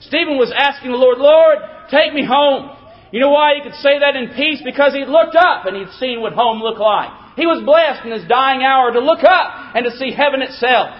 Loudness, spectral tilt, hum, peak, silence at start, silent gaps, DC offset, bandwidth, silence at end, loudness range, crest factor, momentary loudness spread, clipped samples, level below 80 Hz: -14 LUFS; -6 dB/octave; none; 0 dBFS; 0.1 s; none; under 0.1%; 5.8 kHz; 0 s; 2 LU; 14 dB; 9 LU; under 0.1%; -56 dBFS